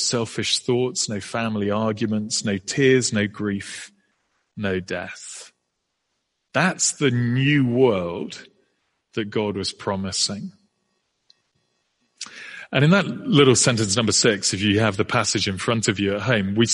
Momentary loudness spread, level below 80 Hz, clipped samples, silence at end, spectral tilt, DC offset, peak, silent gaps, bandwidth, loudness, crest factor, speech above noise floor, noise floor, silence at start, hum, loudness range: 17 LU; -58 dBFS; under 0.1%; 0 s; -4 dB/octave; under 0.1%; -2 dBFS; none; 11.5 kHz; -21 LUFS; 20 dB; 55 dB; -76 dBFS; 0 s; none; 10 LU